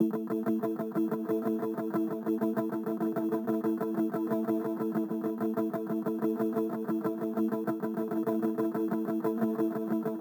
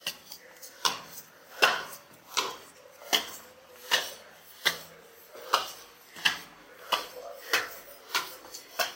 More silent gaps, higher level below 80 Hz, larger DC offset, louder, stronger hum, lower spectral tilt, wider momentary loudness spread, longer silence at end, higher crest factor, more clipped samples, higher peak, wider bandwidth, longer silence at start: neither; second, under -90 dBFS vs -76 dBFS; neither; about the same, -32 LUFS vs -30 LUFS; neither; first, -8.5 dB/octave vs 0.5 dB/octave; second, 2 LU vs 20 LU; about the same, 0 s vs 0 s; second, 16 dB vs 30 dB; neither; second, -16 dBFS vs -4 dBFS; first, over 20 kHz vs 17 kHz; about the same, 0 s vs 0 s